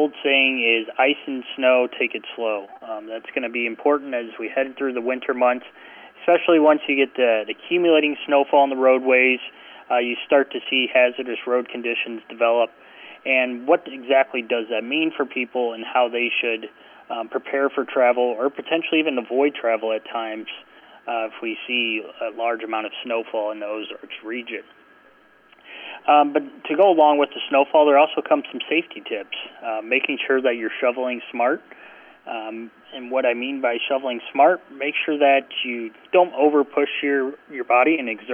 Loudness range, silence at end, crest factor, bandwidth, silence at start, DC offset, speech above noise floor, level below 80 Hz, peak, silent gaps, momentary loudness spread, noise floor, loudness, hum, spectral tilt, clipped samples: 7 LU; 0 s; 16 dB; 3.6 kHz; 0 s; under 0.1%; 33 dB; -78 dBFS; -4 dBFS; none; 14 LU; -54 dBFS; -21 LUFS; none; -6.5 dB/octave; under 0.1%